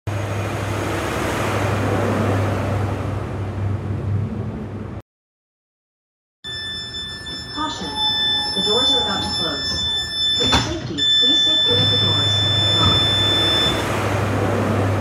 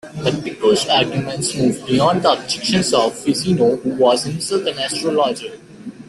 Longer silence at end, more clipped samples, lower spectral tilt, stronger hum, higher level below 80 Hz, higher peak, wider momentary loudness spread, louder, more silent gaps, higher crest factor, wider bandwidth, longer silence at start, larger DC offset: about the same, 0 s vs 0.05 s; neither; about the same, -4 dB/octave vs -4.5 dB/octave; neither; first, -38 dBFS vs -52 dBFS; about the same, 0 dBFS vs -2 dBFS; first, 14 LU vs 7 LU; about the same, -18 LUFS vs -17 LUFS; first, 5.02-6.43 s vs none; about the same, 20 dB vs 16 dB; first, 15.5 kHz vs 12.5 kHz; about the same, 0.05 s vs 0.05 s; neither